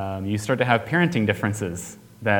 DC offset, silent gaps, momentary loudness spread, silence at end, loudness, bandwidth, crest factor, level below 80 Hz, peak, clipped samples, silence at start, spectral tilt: under 0.1%; none; 11 LU; 0 s; -23 LUFS; 19 kHz; 22 dB; -56 dBFS; 0 dBFS; under 0.1%; 0 s; -5.5 dB/octave